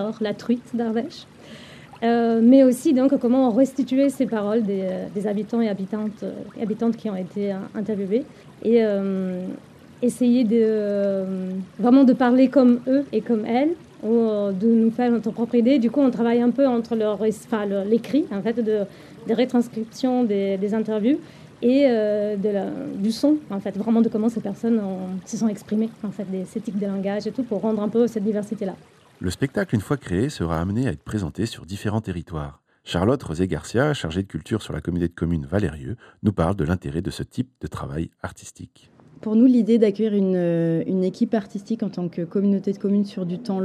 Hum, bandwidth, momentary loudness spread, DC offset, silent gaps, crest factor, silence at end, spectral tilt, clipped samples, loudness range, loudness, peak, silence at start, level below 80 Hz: none; 13 kHz; 12 LU; under 0.1%; none; 18 dB; 0 s; -7.5 dB/octave; under 0.1%; 7 LU; -22 LUFS; -4 dBFS; 0 s; -50 dBFS